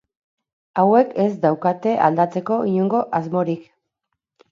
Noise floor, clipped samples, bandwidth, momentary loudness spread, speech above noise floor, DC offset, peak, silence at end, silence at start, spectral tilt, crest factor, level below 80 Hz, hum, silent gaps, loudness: -79 dBFS; under 0.1%; 7.2 kHz; 7 LU; 60 dB; under 0.1%; -2 dBFS; 0.9 s; 0.75 s; -9 dB/octave; 18 dB; -70 dBFS; none; none; -19 LUFS